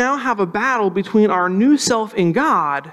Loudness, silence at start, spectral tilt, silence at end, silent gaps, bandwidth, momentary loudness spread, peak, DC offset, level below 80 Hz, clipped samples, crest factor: -17 LUFS; 0 s; -5 dB/octave; 0 s; none; 13.5 kHz; 4 LU; -4 dBFS; under 0.1%; -60 dBFS; under 0.1%; 12 dB